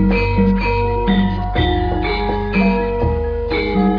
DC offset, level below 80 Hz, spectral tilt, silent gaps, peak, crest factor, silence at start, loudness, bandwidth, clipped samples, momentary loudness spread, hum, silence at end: under 0.1%; -24 dBFS; -9 dB/octave; none; -4 dBFS; 12 dB; 0 s; -17 LUFS; 5.4 kHz; under 0.1%; 4 LU; none; 0 s